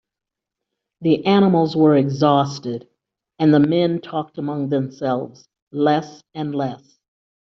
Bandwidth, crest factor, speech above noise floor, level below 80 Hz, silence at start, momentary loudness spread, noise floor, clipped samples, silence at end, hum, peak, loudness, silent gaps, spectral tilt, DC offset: 6.6 kHz; 16 dB; 68 dB; -62 dBFS; 1 s; 14 LU; -86 dBFS; under 0.1%; 0.8 s; none; -4 dBFS; -19 LUFS; 5.62-5.67 s; -6.5 dB/octave; under 0.1%